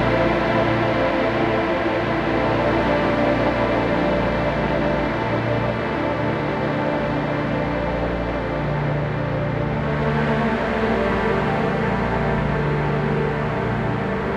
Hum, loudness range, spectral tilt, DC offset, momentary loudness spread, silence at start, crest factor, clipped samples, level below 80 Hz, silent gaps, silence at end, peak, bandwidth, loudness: none; 3 LU; -8 dB/octave; under 0.1%; 4 LU; 0 s; 14 dB; under 0.1%; -34 dBFS; none; 0 s; -6 dBFS; 8.8 kHz; -21 LUFS